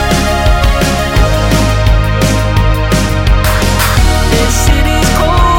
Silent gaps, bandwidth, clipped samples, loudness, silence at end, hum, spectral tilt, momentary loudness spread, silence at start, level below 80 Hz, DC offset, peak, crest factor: none; 17 kHz; under 0.1%; -11 LUFS; 0 s; none; -4.5 dB/octave; 2 LU; 0 s; -12 dBFS; under 0.1%; 0 dBFS; 8 dB